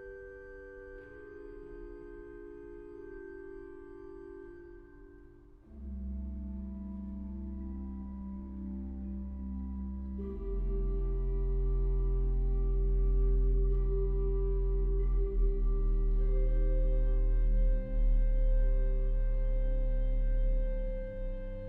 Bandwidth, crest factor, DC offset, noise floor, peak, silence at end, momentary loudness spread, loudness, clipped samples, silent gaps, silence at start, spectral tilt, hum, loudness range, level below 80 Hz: 2.2 kHz; 10 dB; under 0.1%; -55 dBFS; -20 dBFS; 0 s; 16 LU; -35 LUFS; under 0.1%; none; 0 s; -11.5 dB/octave; none; 15 LU; -32 dBFS